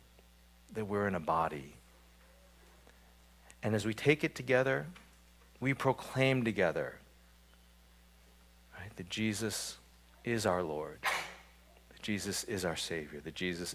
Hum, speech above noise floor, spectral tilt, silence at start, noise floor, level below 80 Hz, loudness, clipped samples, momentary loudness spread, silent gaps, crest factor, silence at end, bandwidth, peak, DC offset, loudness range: none; 27 dB; -4.5 dB/octave; 0.7 s; -62 dBFS; -60 dBFS; -35 LUFS; under 0.1%; 17 LU; none; 24 dB; 0 s; 16 kHz; -14 dBFS; under 0.1%; 6 LU